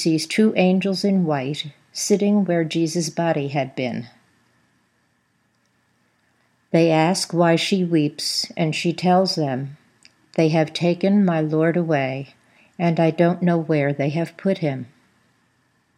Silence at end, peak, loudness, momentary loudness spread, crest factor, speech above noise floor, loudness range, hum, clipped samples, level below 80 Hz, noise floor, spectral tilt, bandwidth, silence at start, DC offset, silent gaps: 1.1 s; -4 dBFS; -20 LUFS; 9 LU; 18 dB; 46 dB; 6 LU; none; under 0.1%; -74 dBFS; -66 dBFS; -5.5 dB/octave; 14 kHz; 0 s; under 0.1%; none